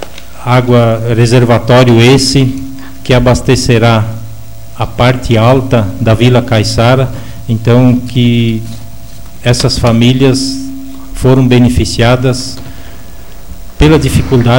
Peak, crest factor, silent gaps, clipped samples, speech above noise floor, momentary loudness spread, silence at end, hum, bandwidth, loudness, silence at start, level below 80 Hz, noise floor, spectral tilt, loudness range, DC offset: 0 dBFS; 10 dB; none; 0.2%; 23 dB; 16 LU; 0 s; none; 17 kHz; -9 LUFS; 0 s; -24 dBFS; -30 dBFS; -6 dB/octave; 3 LU; 7%